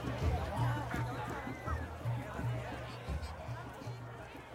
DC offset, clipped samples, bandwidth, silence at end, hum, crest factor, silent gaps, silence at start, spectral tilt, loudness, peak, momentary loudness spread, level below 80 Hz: under 0.1%; under 0.1%; 15.5 kHz; 0 s; none; 16 dB; none; 0 s; -6.5 dB/octave; -40 LUFS; -22 dBFS; 10 LU; -46 dBFS